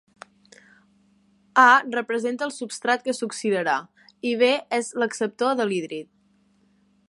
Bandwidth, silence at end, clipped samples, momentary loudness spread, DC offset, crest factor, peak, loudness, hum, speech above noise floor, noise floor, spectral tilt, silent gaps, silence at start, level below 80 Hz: 11.5 kHz; 1.05 s; under 0.1%; 13 LU; under 0.1%; 22 dB; -4 dBFS; -22 LUFS; none; 40 dB; -62 dBFS; -3 dB/octave; none; 1.55 s; -78 dBFS